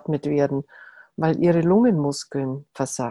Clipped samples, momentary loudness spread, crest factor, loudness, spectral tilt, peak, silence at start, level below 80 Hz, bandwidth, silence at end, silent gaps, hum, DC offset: under 0.1%; 12 LU; 14 dB; -22 LUFS; -6.5 dB/octave; -8 dBFS; 0.1 s; -58 dBFS; 12.5 kHz; 0 s; none; none; under 0.1%